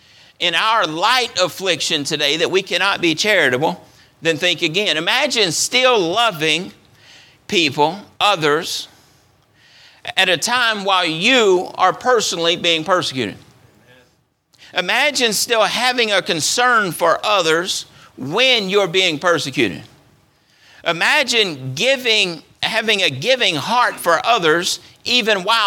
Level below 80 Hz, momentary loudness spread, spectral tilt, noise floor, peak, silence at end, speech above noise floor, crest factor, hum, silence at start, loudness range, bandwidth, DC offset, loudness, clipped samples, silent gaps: -64 dBFS; 8 LU; -2 dB/octave; -60 dBFS; 0 dBFS; 0 s; 43 dB; 18 dB; none; 0.4 s; 3 LU; 18.5 kHz; under 0.1%; -16 LUFS; under 0.1%; none